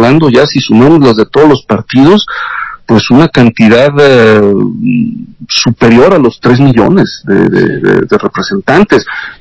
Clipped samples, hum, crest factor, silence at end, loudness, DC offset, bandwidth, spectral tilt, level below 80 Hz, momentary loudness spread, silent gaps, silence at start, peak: 10%; none; 6 dB; 0.05 s; -6 LUFS; under 0.1%; 8 kHz; -6.5 dB/octave; -36 dBFS; 8 LU; none; 0 s; 0 dBFS